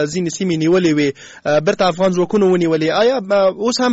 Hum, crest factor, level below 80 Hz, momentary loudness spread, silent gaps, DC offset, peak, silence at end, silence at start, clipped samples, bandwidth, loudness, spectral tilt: none; 12 dB; -54 dBFS; 5 LU; none; under 0.1%; -4 dBFS; 0 s; 0 s; under 0.1%; 8 kHz; -16 LUFS; -5 dB/octave